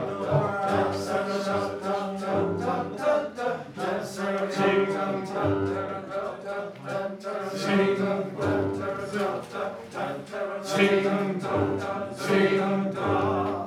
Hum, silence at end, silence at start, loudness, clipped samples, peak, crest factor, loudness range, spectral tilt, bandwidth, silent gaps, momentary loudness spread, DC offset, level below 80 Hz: none; 0 s; 0 s; -27 LUFS; under 0.1%; -8 dBFS; 20 dB; 3 LU; -6 dB/octave; 14 kHz; none; 10 LU; under 0.1%; -66 dBFS